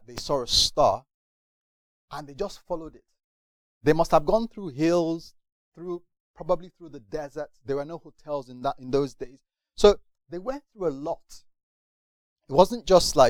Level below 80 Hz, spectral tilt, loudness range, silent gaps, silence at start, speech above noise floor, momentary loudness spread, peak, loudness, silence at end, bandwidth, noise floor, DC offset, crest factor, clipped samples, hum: -44 dBFS; -4 dB/octave; 7 LU; 1.14-2.08 s, 3.24-3.81 s, 5.52-5.72 s, 6.20-6.34 s, 11.63-12.36 s; 0.1 s; over 65 dB; 20 LU; -2 dBFS; -25 LUFS; 0 s; 18.5 kHz; under -90 dBFS; under 0.1%; 24 dB; under 0.1%; none